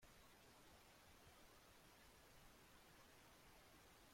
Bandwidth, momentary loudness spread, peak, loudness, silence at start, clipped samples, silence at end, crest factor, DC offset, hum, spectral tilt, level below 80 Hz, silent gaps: 16.5 kHz; 0 LU; -56 dBFS; -68 LUFS; 0 s; under 0.1%; 0 s; 12 dB; under 0.1%; none; -3 dB/octave; -78 dBFS; none